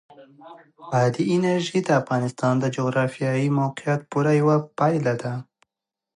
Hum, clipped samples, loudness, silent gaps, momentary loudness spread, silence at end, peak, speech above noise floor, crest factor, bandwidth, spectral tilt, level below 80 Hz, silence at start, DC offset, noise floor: none; under 0.1%; -22 LUFS; none; 6 LU; 0.75 s; -6 dBFS; 64 dB; 16 dB; 11 kHz; -7 dB/octave; -68 dBFS; 0.2 s; under 0.1%; -86 dBFS